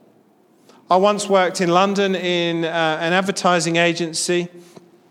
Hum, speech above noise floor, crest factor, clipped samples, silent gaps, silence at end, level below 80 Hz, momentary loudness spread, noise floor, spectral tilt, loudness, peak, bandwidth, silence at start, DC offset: none; 37 dB; 18 dB; under 0.1%; none; 0.5 s; -72 dBFS; 4 LU; -55 dBFS; -4 dB/octave; -18 LUFS; -2 dBFS; 15 kHz; 0.9 s; under 0.1%